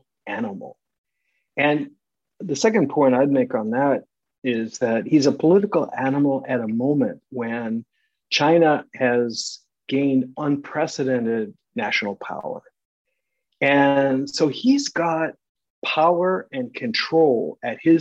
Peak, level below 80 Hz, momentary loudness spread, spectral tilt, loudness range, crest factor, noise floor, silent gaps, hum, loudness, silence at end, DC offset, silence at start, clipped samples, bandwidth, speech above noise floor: -4 dBFS; -70 dBFS; 13 LU; -5 dB/octave; 4 LU; 18 dB; -76 dBFS; 0.98-1.04 s, 4.38-4.42 s, 12.85-13.05 s, 15.49-15.55 s, 15.70-15.82 s; none; -21 LUFS; 0 s; under 0.1%; 0.25 s; under 0.1%; 8.2 kHz; 56 dB